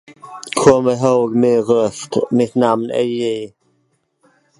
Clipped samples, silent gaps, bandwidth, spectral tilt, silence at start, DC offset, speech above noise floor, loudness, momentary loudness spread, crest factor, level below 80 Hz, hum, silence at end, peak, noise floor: under 0.1%; none; 11.5 kHz; -5.5 dB/octave; 0.1 s; under 0.1%; 49 dB; -16 LUFS; 13 LU; 16 dB; -54 dBFS; none; 1.1 s; 0 dBFS; -64 dBFS